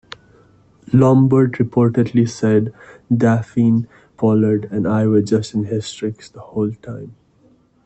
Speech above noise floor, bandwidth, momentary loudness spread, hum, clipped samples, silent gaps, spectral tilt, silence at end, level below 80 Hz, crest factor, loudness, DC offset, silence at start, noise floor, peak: 38 dB; 8.4 kHz; 14 LU; none; under 0.1%; none; -8 dB/octave; 0.75 s; -54 dBFS; 14 dB; -17 LUFS; under 0.1%; 0.9 s; -54 dBFS; -2 dBFS